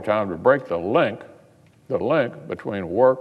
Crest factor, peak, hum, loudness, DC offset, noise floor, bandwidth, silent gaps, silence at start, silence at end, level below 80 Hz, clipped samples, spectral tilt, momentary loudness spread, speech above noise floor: 18 dB; -4 dBFS; none; -22 LUFS; under 0.1%; -53 dBFS; 5 kHz; none; 0 s; 0 s; -64 dBFS; under 0.1%; -8 dB/octave; 10 LU; 32 dB